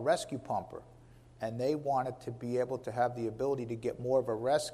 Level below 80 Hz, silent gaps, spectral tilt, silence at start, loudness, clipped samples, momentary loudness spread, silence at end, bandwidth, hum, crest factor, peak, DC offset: -64 dBFS; none; -5.5 dB/octave; 0 s; -34 LUFS; under 0.1%; 9 LU; 0 s; 14.5 kHz; none; 18 dB; -16 dBFS; under 0.1%